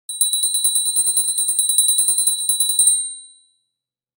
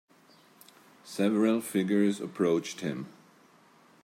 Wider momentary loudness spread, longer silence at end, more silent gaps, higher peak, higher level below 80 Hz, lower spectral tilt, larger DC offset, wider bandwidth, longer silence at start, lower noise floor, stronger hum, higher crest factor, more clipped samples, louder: second, 4 LU vs 14 LU; about the same, 0.9 s vs 0.9 s; neither; first, 0 dBFS vs -14 dBFS; second, under -90 dBFS vs -80 dBFS; second, 10.5 dB/octave vs -6 dB/octave; neither; first, 19 kHz vs 16 kHz; second, 0.1 s vs 1.05 s; first, -82 dBFS vs -60 dBFS; neither; about the same, 20 dB vs 16 dB; neither; first, -15 LUFS vs -29 LUFS